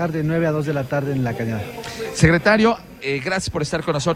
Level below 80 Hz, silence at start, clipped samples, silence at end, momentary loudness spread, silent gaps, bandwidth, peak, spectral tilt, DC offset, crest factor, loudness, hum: -42 dBFS; 0 s; under 0.1%; 0 s; 11 LU; none; 13.5 kHz; 0 dBFS; -5.5 dB/octave; under 0.1%; 20 dB; -20 LUFS; none